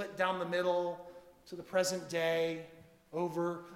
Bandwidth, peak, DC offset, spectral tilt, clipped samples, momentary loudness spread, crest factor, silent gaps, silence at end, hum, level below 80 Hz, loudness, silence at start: 16 kHz; -16 dBFS; under 0.1%; -4 dB/octave; under 0.1%; 16 LU; 18 dB; none; 0 s; none; -76 dBFS; -35 LUFS; 0 s